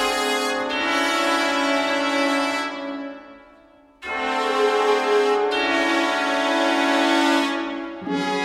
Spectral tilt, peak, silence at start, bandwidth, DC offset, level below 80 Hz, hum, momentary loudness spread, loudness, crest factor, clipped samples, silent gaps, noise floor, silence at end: -2.5 dB/octave; -6 dBFS; 0 s; 16 kHz; under 0.1%; -60 dBFS; none; 11 LU; -21 LUFS; 14 dB; under 0.1%; none; -51 dBFS; 0 s